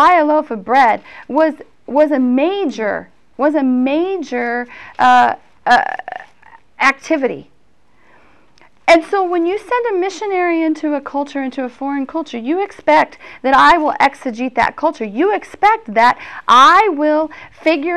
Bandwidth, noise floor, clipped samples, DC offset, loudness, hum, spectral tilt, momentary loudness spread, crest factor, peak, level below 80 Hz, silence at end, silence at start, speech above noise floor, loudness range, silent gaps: 12 kHz; -57 dBFS; under 0.1%; 0.4%; -15 LUFS; none; -4 dB/octave; 12 LU; 12 dB; -2 dBFS; -52 dBFS; 0 s; 0 s; 42 dB; 5 LU; none